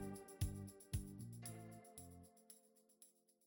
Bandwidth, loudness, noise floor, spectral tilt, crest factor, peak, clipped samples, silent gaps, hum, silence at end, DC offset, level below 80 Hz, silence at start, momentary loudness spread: 17.5 kHz; -52 LUFS; -72 dBFS; -5.5 dB/octave; 22 dB; -30 dBFS; under 0.1%; none; none; 0.35 s; under 0.1%; -60 dBFS; 0 s; 20 LU